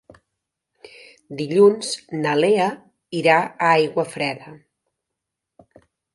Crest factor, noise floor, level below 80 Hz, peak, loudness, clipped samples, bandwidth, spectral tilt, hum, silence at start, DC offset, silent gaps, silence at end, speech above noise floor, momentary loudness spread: 20 dB; -82 dBFS; -70 dBFS; -2 dBFS; -19 LUFS; under 0.1%; 11.5 kHz; -5 dB/octave; none; 1.3 s; under 0.1%; none; 1.6 s; 63 dB; 15 LU